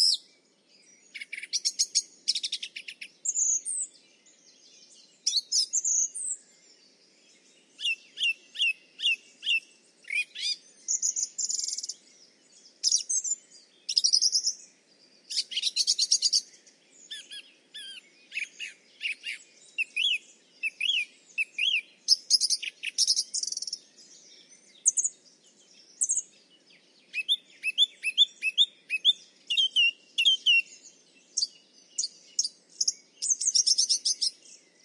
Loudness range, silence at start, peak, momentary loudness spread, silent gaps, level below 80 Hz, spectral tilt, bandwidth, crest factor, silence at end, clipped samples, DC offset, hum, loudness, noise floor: 6 LU; 0 s; -8 dBFS; 16 LU; none; under -90 dBFS; 5.5 dB/octave; 12 kHz; 24 dB; 0.55 s; under 0.1%; under 0.1%; none; -26 LUFS; -63 dBFS